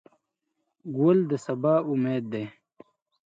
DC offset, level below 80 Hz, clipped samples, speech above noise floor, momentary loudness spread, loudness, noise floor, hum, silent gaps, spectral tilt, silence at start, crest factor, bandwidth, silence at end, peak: under 0.1%; -76 dBFS; under 0.1%; 55 dB; 14 LU; -26 LUFS; -80 dBFS; none; none; -8.5 dB/octave; 0.85 s; 18 dB; 7.8 kHz; 0.75 s; -10 dBFS